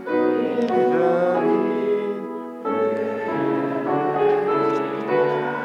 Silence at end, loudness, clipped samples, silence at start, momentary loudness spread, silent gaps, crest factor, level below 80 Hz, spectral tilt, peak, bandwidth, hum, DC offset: 0 s; -21 LUFS; under 0.1%; 0 s; 6 LU; none; 12 dB; -74 dBFS; -8 dB/octave; -8 dBFS; 7.2 kHz; none; under 0.1%